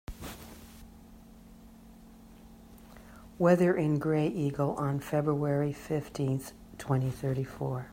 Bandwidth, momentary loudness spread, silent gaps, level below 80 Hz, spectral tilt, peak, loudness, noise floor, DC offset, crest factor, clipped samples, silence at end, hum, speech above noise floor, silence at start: 16 kHz; 25 LU; none; -56 dBFS; -8 dB/octave; -10 dBFS; -30 LUFS; -53 dBFS; under 0.1%; 22 dB; under 0.1%; 0 s; none; 23 dB; 0.1 s